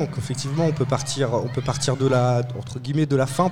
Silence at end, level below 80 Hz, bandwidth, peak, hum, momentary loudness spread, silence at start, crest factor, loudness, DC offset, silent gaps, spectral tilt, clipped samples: 0 s; -50 dBFS; 14 kHz; -6 dBFS; none; 7 LU; 0 s; 16 dB; -23 LUFS; 0.6%; none; -6 dB/octave; under 0.1%